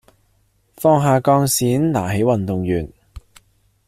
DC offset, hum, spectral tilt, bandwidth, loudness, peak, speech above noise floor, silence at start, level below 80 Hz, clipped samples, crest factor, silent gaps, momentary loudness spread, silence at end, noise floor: under 0.1%; none; -6 dB/octave; 16 kHz; -17 LUFS; -2 dBFS; 44 dB; 0.8 s; -46 dBFS; under 0.1%; 16 dB; none; 7 LU; 0.7 s; -61 dBFS